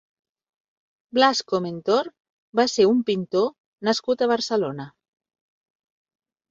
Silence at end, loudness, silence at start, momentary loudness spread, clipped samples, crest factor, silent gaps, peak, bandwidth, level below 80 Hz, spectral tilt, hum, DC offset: 1.6 s; -22 LUFS; 1.15 s; 10 LU; under 0.1%; 22 dB; 2.20-2.53 s, 3.60-3.78 s; -4 dBFS; 7.8 kHz; -68 dBFS; -4.5 dB/octave; none; under 0.1%